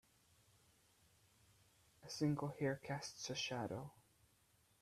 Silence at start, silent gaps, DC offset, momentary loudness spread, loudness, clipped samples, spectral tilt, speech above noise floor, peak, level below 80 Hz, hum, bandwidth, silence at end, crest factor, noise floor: 2 s; none; under 0.1%; 11 LU; -44 LUFS; under 0.1%; -5 dB/octave; 32 dB; -28 dBFS; -78 dBFS; none; 14.5 kHz; 0.9 s; 20 dB; -76 dBFS